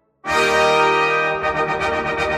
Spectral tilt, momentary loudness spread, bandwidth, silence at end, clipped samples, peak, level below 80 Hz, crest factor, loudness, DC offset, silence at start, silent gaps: -3.5 dB/octave; 6 LU; 15 kHz; 0 s; under 0.1%; -4 dBFS; -44 dBFS; 14 dB; -17 LUFS; under 0.1%; 0.25 s; none